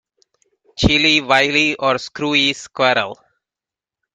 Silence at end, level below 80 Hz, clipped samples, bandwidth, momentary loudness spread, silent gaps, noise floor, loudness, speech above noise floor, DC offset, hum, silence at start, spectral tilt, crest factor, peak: 1 s; -38 dBFS; under 0.1%; 11 kHz; 7 LU; none; -88 dBFS; -15 LUFS; 72 dB; under 0.1%; none; 0.75 s; -3.5 dB/octave; 18 dB; 0 dBFS